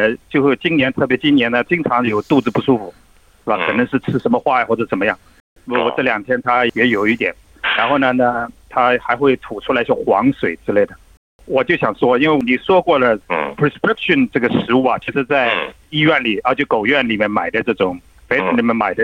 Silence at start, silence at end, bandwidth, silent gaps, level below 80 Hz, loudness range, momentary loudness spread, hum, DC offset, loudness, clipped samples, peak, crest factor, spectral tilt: 0 s; 0 s; 9.4 kHz; 5.40-5.56 s, 11.17-11.39 s; -50 dBFS; 2 LU; 6 LU; none; under 0.1%; -16 LUFS; under 0.1%; -2 dBFS; 14 dB; -7 dB/octave